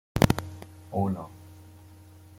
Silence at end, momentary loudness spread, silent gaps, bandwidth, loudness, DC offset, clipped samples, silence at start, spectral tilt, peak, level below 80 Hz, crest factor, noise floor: 0.2 s; 26 LU; none; 16.5 kHz; -28 LUFS; under 0.1%; under 0.1%; 0.15 s; -6 dB/octave; -4 dBFS; -46 dBFS; 28 dB; -50 dBFS